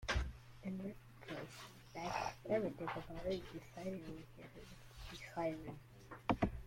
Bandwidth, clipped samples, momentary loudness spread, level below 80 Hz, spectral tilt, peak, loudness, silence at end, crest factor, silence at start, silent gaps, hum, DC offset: 16.5 kHz; under 0.1%; 17 LU; -54 dBFS; -5.5 dB/octave; -20 dBFS; -45 LUFS; 0 s; 24 dB; 0 s; none; none; under 0.1%